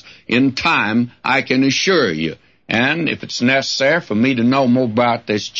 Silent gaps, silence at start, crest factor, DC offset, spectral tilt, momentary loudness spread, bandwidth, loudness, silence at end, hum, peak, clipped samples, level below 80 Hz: none; 0.05 s; 14 dB; under 0.1%; -4.5 dB/octave; 5 LU; 7.6 kHz; -16 LUFS; 0 s; none; -4 dBFS; under 0.1%; -56 dBFS